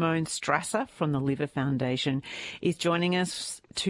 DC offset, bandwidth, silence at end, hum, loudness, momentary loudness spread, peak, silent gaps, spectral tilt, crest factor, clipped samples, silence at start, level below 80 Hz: under 0.1%; 11.5 kHz; 0 s; none; -29 LUFS; 6 LU; -10 dBFS; none; -5 dB/octave; 20 dB; under 0.1%; 0 s; -62 dBFS